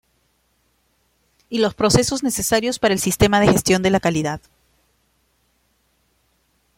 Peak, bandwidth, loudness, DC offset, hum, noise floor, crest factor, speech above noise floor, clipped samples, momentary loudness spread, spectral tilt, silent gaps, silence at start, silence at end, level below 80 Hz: -2 dBFS; 16.5 kHz; -18 LUFS; under 0.1%; none; -65 dBFS; 20 dB; 47 dB; under 0.1%; 8 LU; -4 dB/octave; none; 1.5 s; 2.4 s; -44 dBFS